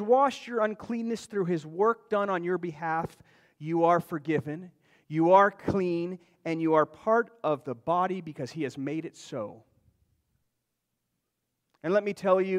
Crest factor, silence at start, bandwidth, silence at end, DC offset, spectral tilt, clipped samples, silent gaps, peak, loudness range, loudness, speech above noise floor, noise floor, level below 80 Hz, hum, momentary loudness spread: 20 dB; 0 s; 14 kHz; 0 s; under 0.1%; -7 dB/octave; under 0.1%; none; -8 dBFS; 10 LU; -28 LUFS; 55 dB; -82 dBFS; -66 dBFS; none; 14 LU